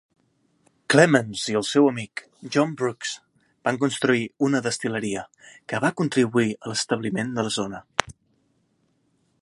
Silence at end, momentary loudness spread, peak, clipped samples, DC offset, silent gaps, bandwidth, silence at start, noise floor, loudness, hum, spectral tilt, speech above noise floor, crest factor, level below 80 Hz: 1.3 s; 13 LU; 0 dBFS; under 0.1%; under 0.1%; none; 11.5 kHz; 0.9 s; -68 dBFS; -23 LUFS; none; -4.5 dB/octave; 45 dB; 24 dB; -62 dBFS